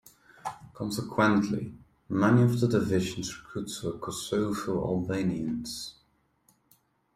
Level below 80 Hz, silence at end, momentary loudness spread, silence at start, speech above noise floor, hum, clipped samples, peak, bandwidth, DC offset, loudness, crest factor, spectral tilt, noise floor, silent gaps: -58 dBFS; 1.25 s; 16 LU; 0.45 s; 40 dB; none; under 0.1%; -10 dBFS; 15 kHz; under 0.1%; -29 LUFS; 20 dB; -6 dB/octave; -68 dBFS; none